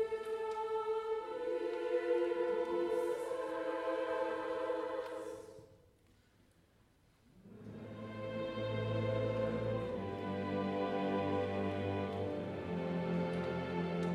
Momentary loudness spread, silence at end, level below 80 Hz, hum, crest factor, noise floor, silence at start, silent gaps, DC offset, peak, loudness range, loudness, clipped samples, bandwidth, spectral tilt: 9 LU; 0 s; -66 dBFS; none; 14 dB; -69 dBFS; 0 s; none; under 0.1%; -24 dBFS; 9 LU; -38 LUFS; under 0.1%; 12.5 kHz; -7.5 dB/octave